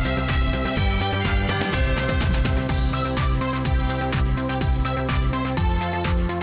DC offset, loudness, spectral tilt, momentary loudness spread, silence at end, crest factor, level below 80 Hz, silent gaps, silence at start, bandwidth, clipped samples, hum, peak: under 0.1%; -23 LUFS; -10.5 dB/octave; 1 LU; 0 s; 10 dB; -26 dBFS; none; 0 s; 4 kHz; under 0.1%; none; -10 dBFS